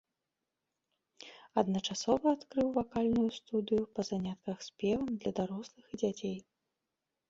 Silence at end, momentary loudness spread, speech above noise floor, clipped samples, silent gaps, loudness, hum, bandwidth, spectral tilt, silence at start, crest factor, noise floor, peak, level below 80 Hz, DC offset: 0.9 s; 13 LU; 54 dB; under 0.1%; none; -34 LUFS; none; 7.8 kHz; -5.5 dB/octave; 1.2 s; 22 dB; -88 dBFS; -14 dBFS; -64 dBFS; under 0.1%